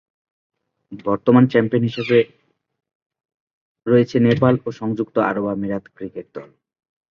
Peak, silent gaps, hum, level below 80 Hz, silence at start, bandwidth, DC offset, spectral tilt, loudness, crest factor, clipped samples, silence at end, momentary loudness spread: 0 dBFS; 2.95-3.10 s, 3.34-3.75 s; none; -56 dBFS; 0.9 s; 6.8 kHz; under 0.1%; -8.5 dB/octave; -18 LUFS; 20 dB; under 0.1%; 0.65 s; 18 LU